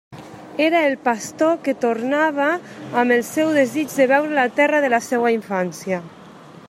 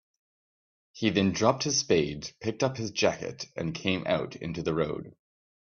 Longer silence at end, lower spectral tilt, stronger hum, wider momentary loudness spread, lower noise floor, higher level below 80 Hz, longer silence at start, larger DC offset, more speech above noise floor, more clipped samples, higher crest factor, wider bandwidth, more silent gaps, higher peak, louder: second, 0 s vs 0.7 s; about the same, -4.5 dB/octave vs -4 dB/octave; neither; about the same, 10 LU vs 10 LU; second, -42 dBFS vs under -90 dBFS; second, -68 dBFS vs -60 dBFS; second, 0.1 s vs 0.95 s; neither; second, 23 dB vs over 61 dB; neither; second, 16 dB vs 22 dB; first, 15.5 kHz vs 7.2 kHz; neither; first, -2 dBFS vs -8 dBFS; first, -19 LUFS vs -29 LUFS